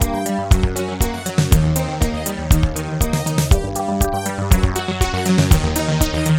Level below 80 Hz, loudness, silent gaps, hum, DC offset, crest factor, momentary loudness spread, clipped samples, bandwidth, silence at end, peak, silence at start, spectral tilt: -22 dBFS; -18 LUFS; none; none; under 0.1%; 16 dB; 6 LU; under 0.1%; 19 kHz; 0 s; 0 dBFS; 0 s; -5.5 dB/octave